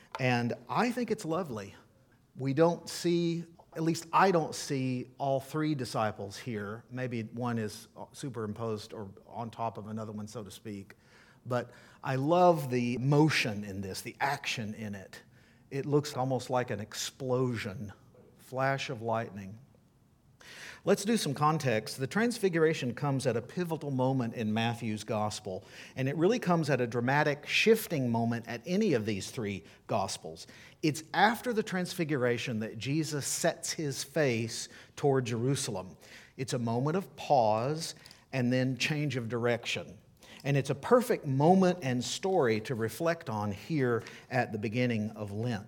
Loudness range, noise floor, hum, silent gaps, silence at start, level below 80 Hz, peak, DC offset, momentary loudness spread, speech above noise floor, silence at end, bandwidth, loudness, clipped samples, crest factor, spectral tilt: 7 LU; -64 dBFS; none; none; 0.15 s; -70 dBFS; -10 dBFS; under 0.1%; 15 LU; 33 dB; 0 s; 19 kHz; -31 LUFS; under 0.1%; 22 dB; -5.5 dB/octave